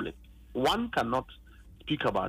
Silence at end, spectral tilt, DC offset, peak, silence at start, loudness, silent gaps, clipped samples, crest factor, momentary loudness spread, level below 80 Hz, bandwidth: 0 s; -5 dB/octave; under 0.1%; -16 dBFS; 0 s; -31 LUFS; none; under 0.1%; 16 dB; 14 LU; -52 dBFS; 15.5 kHz